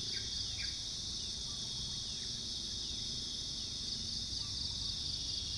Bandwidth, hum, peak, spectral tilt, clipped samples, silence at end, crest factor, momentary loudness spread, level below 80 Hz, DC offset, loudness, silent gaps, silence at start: 10.5 kHz; none; -26 dBFS; -1.5 dB/octave; under 0.1%; 0 s; 14 dB; 2 LU; -54 dBFS; under 0.1%; -38 LUFS; none; 0 s